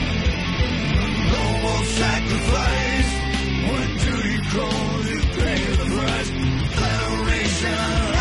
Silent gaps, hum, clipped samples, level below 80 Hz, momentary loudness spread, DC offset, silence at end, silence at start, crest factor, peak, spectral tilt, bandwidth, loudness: none; none; under 0.1%; -26 dBFS; 2 LU; under 0.1%; 0 s; 0 s; 12 dB; -8 dBFS; -5 dB/octave; 11.5 kHz; -21 LUFS